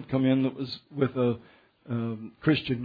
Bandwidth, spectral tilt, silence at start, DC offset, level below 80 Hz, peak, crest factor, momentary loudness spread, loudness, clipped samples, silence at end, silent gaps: 5 kHz; -9.5 dB/octave; 0 s; under 0.1%; -62 dBFS; -10 dBFS; 18 dB; 11 LU; -29 LUFS; under 0.1%; 0 s; none